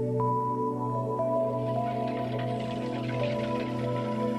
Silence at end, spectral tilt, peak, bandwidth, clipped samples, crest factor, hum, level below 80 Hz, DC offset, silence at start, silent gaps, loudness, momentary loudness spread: 0 s; -8 dB/octave; -16 dBFS; 12 kHz; under 0.1%; 12 dB; none; -58 dBFS; under 0.1%; 0 s; none; -30 LUFS; 4 LU